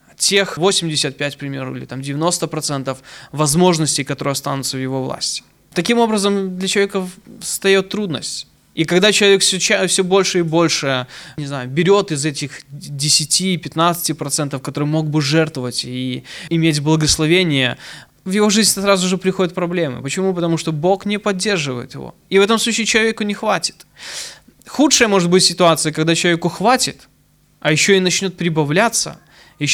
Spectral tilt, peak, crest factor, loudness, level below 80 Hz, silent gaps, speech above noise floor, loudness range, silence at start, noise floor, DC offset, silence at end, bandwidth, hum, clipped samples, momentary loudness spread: -3.5 dB/octave; 0 dBFS; 16 dB; -16 LUFS; -50 dBFS; none; 38 dB; 4 LU; 0.2 s; -55 dBFS; under 0.1%; 0 s; 17.5 kHz; none; under 0.1%; 14 LU